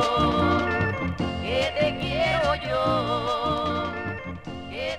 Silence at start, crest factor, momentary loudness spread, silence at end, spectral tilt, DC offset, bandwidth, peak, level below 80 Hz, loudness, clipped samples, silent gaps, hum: 0 s; 16 dB; 10 LU; 0 s; -6 dB/octave; under 0.1%; 14.5 kHz; -10 dBFS; -42 dBFS; -25 LUFS; under 0.1%; none; none